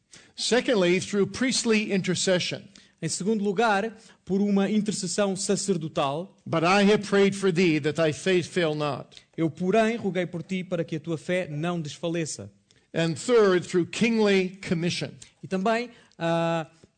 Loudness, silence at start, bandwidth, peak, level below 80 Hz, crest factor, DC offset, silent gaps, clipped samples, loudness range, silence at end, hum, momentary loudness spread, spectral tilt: -25 LUFS; 0.15 s; 9.4 kHz; -12 dBFS; -64 dBFS; 12 dB; under 0.1%; none; under 0.1%; 4 LU; 0.3 s; none; 11 LU; -5 dB/octave